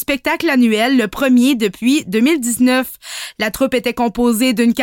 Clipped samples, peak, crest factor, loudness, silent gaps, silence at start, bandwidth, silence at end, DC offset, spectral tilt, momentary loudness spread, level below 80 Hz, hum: under 0.1%; -4 dBFS; 10 dB; -15 LUFS; none; 0 s; 17 kHz; 0 s; under 0.1%; -3.5 dB/octave; 7 LU; -46 dBFS; none